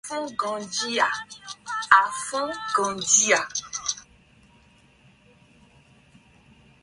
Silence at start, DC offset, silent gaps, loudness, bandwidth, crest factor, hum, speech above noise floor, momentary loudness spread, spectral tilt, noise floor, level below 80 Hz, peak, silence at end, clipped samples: 0.05 s; under 0.1%; none; -23 LUFS; 11.5 kHz; 26 dB; none; 33 dB; 14 LU; 0 dB/octave; -57 dBFS; -64 dBFS; 0 dBFS; 2.8 s; under 0.1%